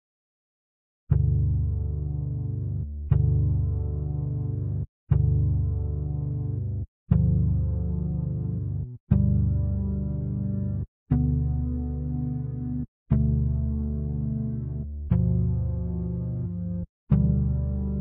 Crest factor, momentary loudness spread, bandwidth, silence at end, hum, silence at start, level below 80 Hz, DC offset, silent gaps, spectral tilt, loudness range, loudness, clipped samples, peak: 20 dB; 8 LU; 2 kHz; 0 s; none; 1.1 s; -32 dBFS; under 0.1%; 4.89-5.07 s, 6.88-7.06 s, 9.00-9.07 s, 10.88-11.06 s, 12.88-13.06 s, 16.89-17.07 s; -14 dB/octave; 2 LU; -27 LUFS; under 0.1%; -6 dBFS